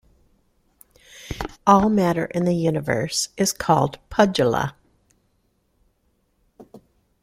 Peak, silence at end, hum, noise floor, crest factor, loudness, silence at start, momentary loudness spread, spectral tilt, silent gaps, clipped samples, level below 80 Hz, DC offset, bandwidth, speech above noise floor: -2 dBFS; 0.45 s; none; -67 dBFS; 22 dB; -21 LUFS; 1.15 s; 14 LU; -5 dB/octave; none; under 0.1%; -48 dBFS; under 0.1%; 16 kHz; 47 dB